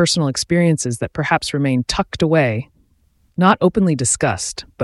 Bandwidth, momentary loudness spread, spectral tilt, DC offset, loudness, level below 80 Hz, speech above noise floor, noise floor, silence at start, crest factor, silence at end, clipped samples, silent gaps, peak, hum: 12 kHz; 8 LU; -4.5 dB/octave; under 0.1%; -17 LUFS; -42 dBFS; 41 dB; -58 dBFS; 0 s; 16 dB; 0 s; under 0.1%; none; -2 dBFS; none